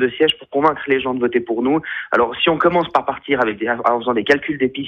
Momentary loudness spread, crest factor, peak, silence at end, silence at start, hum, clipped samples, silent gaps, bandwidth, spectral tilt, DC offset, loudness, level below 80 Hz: 4 LU; 16 dB; 0 dBFS; 0 s; 0 s; none; under 0.1%; none; 9.2 kHz; -6 dB/octave; under 0.1%; -18 LUFS; -54 dBFS